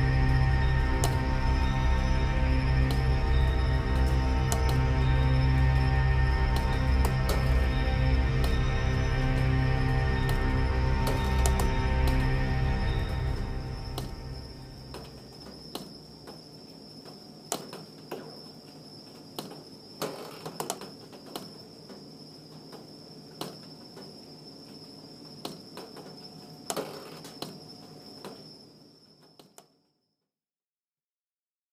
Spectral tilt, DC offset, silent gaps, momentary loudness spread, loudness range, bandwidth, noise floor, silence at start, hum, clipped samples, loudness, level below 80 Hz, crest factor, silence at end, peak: -6 dB/octave; under 0.1%; none; 20 LU; 18 LU; 15.5 kHz; under -90 dBFS; 0 s; none; under 0.1%; -28 LUFS; -30 dBFS; 20 dB; 3.15 s; -8 dBFS